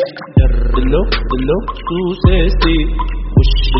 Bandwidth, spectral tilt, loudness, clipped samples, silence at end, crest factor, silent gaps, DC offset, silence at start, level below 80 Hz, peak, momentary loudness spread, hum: 5.8 kHz; -5.5 dB/octave; -15 LUFS; under 0.1%; 0 s; 12 dB; none; 0.5%; 0 s; -14 dBFS; 0 dBFS; 6 LU; none